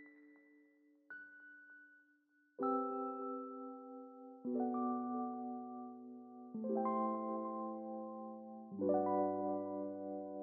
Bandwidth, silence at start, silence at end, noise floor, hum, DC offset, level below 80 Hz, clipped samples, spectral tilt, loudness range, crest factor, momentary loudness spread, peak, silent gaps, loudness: 2.3 kHz; 0 s; 0 s; -75 dBFS; none; under 0.1%; under -90 dBFS; under 0.1%; -9.5 dB/octave; 5 LU; 18 dB; 18 LU; -24 dBFS; none; -41 LUFS